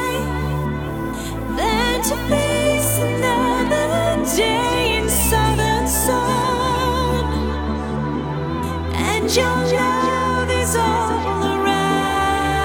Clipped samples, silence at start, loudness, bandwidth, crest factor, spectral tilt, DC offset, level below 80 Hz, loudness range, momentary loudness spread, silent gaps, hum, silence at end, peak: under 0.1%; 0 s; -19 LUFS; over 20 kHz; 14 dB; -4 dB/octave; under 0.1%; -30 dBFS; 3 LU; 6 LU; none; none; 0 s; -4 dBFS